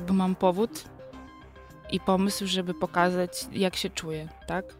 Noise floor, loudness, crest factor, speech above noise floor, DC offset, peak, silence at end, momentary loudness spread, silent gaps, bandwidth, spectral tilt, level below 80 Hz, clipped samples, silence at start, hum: -48 dBFS; -28 LUFS; 18 dB; 21 dB; under 0.1%; -10 dBFS; 0.05 s; 20 LU; none; 16 kHz; -5 dB/octave; -52 dBFS; under 0.1%; 0 s; none